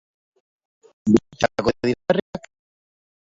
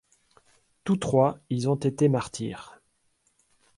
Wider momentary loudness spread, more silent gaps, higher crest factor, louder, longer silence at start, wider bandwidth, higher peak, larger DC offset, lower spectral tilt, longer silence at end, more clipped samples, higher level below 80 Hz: about the same, 12 LU vs 13 LU; first, 2.22-2.33 s vs none; about the same, 24 dB vs 20 dB; first, -22 LUFS vs -26 LUFS; first, 1.05 s vs 0.85 s; second, 7.8 kHz vs 11.5 kHz; first, -2 dBFS vs -8 dBFS; neither; about the same, -6 dB/octave vs -7 dB/octave; second, 0.95 s vs 1.1 s; neither; first, -52 dBFS vs -60 dBFS